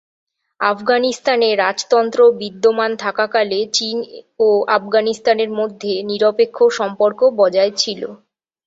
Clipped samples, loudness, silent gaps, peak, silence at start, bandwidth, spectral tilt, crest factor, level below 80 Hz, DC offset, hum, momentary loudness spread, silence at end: under 0.1%; -16 LUFS; none; -2 dBFS; 0.6 s; 8 kHz; -3 dB/octave; 14 dB; -66 dBFS; under 0.1%; none; 7 LU; 0.5 s